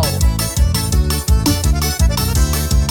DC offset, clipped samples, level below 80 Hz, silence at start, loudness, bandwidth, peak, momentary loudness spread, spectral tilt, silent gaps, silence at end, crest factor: under 0.1%; under 0.1%; -18 dBFS; 0 s; -16 LUFS; over 20 kHz; -2 dBFS; 1 LU; -4.5 dB/octave; none; 0 s; 12 dB